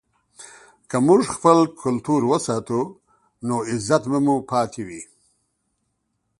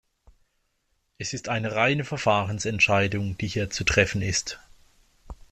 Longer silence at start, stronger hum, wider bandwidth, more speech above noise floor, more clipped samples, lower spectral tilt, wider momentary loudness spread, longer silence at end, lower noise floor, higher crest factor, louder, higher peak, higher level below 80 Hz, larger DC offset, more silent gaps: second, 0.4 s vs 1.2 s; neither; second, 11.5 kHz vs 13 kHz; first, 54 dB vs 47 dB; neither; first, -6 dB/octave vs -4 dB/octave; about the same, 14 LU vs 12 LU; first, 1.35 s vs 0.15 s; about the same, -73 dBFS vs -72 dBFS; about the same, 22 dB vs 24 dB; first, -21 LUFS vs -24 LUFS; first, 0 dBFS vs -4 dBFS; second, -60 dBFS vs -48 dBFS; neither; neither